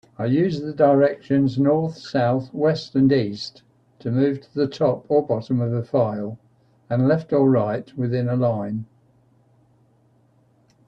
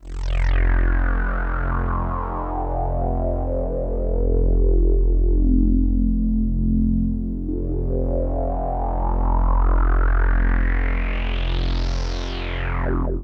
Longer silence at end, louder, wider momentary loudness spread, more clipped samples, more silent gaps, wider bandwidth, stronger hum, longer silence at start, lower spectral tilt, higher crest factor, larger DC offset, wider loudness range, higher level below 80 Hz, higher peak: first, 2.05 s vs 0 s; about the same, -21 LUFS vs -23 LUFS; first, 10 LU vs 6 LU; neither; neither; first, 7.6 kHz vs 6 kHz; neither; first, 0.2 s vs 0 s; about the same, -8.5 dB/octave vs -8 dB/octave; first, 18 dB vs 12 dB; neither; about the same, 3 LU vs 3 LU; second, -60 dBFS vs -20 dBFS; first, -4 dBFS vs -8 dBFS